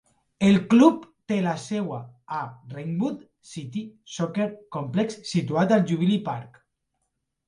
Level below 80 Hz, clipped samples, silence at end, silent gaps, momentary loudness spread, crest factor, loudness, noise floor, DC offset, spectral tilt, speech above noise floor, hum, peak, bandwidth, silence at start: -64 dBFS; under 0.1%; 1 s; none; 18 LU; 20 dB; -24 LUFS; -78 dBFS; under 0.1%; -6.5 dB/octave; 54 dB; none; -6 dBFS; 10.5 kHz; 0.4 s